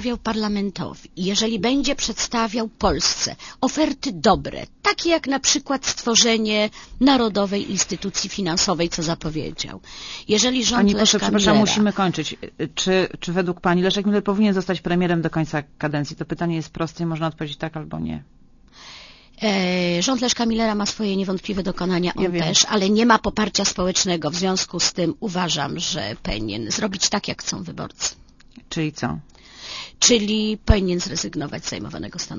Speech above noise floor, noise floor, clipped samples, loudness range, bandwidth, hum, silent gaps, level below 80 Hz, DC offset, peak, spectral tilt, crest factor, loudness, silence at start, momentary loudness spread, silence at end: 26 dB; -47 dBFS; under 0.1%; 6 LU; 7.4 kHz; none; none; -38 dBFS; under 0.1%; 0 dBFS; -3.5 dB/octave; 20 dB; -21 LUFS; 0 s; 13 LU; 0 s